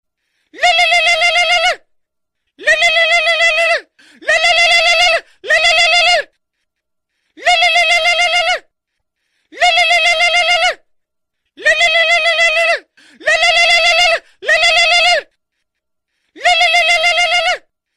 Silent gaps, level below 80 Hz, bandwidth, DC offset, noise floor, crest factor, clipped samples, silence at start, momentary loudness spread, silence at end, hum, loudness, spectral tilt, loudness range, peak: none; -48 dBFS; 14.5 kHz; under 0.1%; -74 dBFS; 12 dB; under 0.1%; 0.55 s; 8 LU; 0.4 s; none; -10 LUFS; 2 dB/octave; 3 LU; -2 dBFS